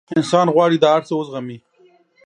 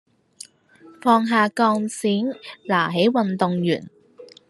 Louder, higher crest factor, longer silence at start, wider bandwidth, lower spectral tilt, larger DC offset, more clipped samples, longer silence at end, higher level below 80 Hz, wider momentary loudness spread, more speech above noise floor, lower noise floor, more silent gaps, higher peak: first, -16 LUFS vs -21 LUFS; about the same, 18 dB vs 20 dB; second, 0.1 s vs 1.05 s; second, 10.5 kHz vs 12.5 kHz; about the same, -6 dB/octave vs -5.5 dB/octave; neither; neither; first, 0.7 s vs 0.25 s; about the same, -66 dBFS vs -70 dBFS; second, 15 LU vs 21 LU; first, 38 dB vs 30 dB; first, -54 dBFS vs -50 dBFS; neither; about the same, 0 dBFS vs -2 dBFS